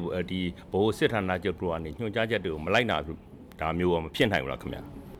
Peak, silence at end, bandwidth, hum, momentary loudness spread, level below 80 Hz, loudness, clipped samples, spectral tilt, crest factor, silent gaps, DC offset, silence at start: -10 dBFS; 0 s; 16 kHz; none; 12 LU; -48 dBFS; -29 LUFS; under 0.1%; -6 dB/octave; 20 dB; none; under 0.1%; 0 s